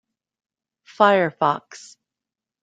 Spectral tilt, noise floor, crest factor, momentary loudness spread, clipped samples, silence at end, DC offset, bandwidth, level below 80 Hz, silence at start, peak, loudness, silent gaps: -5.5 dB/octave; -88 dBFS; 22 dB; 14 LU; under 0.1%; 0.85 s; under 0.1%; 9.2 kHz; -72 dBFS; 1 s; -2 dBFS; -19 LUFS; none